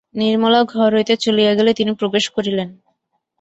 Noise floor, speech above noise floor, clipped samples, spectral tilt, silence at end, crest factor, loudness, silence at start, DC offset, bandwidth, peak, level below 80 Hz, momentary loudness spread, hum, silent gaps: -70 dBFS; 54 dB; under 0.1%; -5 dB/octave; 0.7 s; 14 dB; -16 LUFS; 0.15 s; under 0.1%; 8.2 kHz; -2 dBFS; -60 dBFS; 7 LU; none; none